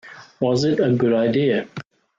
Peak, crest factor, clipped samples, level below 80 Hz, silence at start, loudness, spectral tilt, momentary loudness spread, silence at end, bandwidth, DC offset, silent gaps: -8 dBFS; 14 dB; under 0.1%; -60 dBFS; 0.05 s; -20 LUFS; -7 dB/octave; 11 LU; 0.35 s; 7.8 kHz; under 0.1%; none